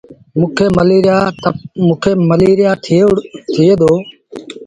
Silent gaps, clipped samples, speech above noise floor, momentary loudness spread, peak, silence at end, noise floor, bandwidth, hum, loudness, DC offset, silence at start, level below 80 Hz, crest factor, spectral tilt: none; under 0.1%; 20 dB; 10 LU; 0 dBFS; 0 s; -30 dBFS; 10.5 kHz; none; -12 LUFS; under 0.1%; 0.1 s; -42 dBFS; 12 dB; -7.5 dB/octave